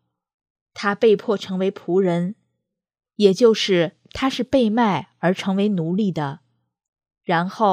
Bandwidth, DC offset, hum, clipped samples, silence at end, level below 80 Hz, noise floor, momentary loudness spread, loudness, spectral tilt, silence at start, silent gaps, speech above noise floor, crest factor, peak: 10.5 kHz; under 0.1%; none; under 0.1%; 0 s; -58 dBFS; -78 dBFS; 10 LU; -20 LUFS; -6 dB/octave; 0.75 s; 6.89-6.93 s; 59 dB; 20 dB; -2 dBFS